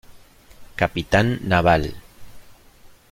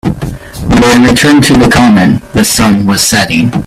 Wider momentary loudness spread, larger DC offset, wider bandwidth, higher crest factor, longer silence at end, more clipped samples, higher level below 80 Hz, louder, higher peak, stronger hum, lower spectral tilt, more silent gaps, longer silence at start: about the same, 12 LU vs 10 LU; neither; about the same, 16.5 kHz vs 16 kHz; first, 20 dB vs 6 dB; first, 0.25 s vs 0.05 s; second, under 0.1% vs 0.2%; second, -40 dBFS vs -26 dBFS; second, -20 LUFS vs -6 LUFS; about the same, -2 dBFS vs 0 dBFS; neither; first, -6.5 dB/octave vs -4.5 dB/octave; neither; about the same, 0.1 s vs 0.05 s